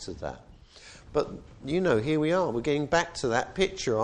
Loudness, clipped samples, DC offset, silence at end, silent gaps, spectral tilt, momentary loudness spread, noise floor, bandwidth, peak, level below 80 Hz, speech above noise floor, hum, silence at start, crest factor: -28 LUFS; under 0.1%; under 0.1%; 0 s; none; -5 dB/octave; 15 LU; -51 dBFS; 10 kHz; -10 dBFS; -50 dBFS; 23 dB; none; 0 s; 18 dB